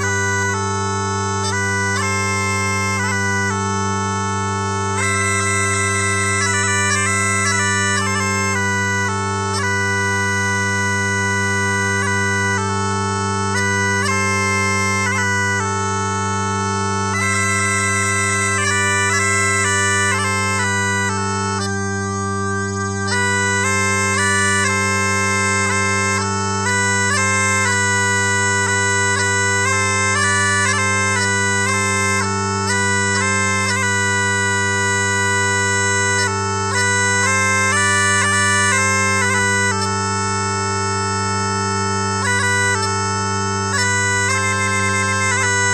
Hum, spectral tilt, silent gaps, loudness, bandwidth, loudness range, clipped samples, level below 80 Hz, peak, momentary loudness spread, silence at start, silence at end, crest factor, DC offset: none; -3 dB/octave; none; -17 LUFS; 13.5 kHz; 3 LU; under 0.1%; -56 dBFS; -2 dBFS; 5 LU; 0 s; 0 s; 16 dB; 0.1%